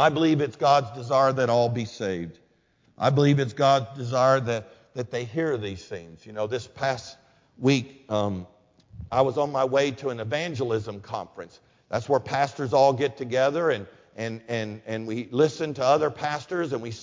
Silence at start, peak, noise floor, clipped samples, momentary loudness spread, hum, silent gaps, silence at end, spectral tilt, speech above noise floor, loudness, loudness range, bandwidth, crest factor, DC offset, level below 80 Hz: 0 s; -6 dBFS; -64 dBFS; under 0.1%; 14 LU; none; none; 0 s; -6 dB/octave; 40 dB; -25 LUFS; 5 LU; 7.6 kHz; 18 dB; under 0.1%; -58 dBFS